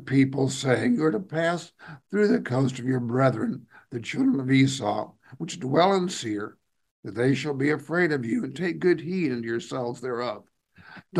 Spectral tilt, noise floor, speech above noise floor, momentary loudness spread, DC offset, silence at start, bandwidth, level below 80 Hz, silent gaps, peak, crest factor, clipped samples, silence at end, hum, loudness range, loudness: -6 dB/octave; -49 dBFS; 24 dB; 14 LU; under 0.1%; 0 s; 12 kHz; -70 dBFS; 6.91-7.03 s; -6 dBFS; 20 dB; under 0.1%; 0 s; none; 2 LU; -25 LUFS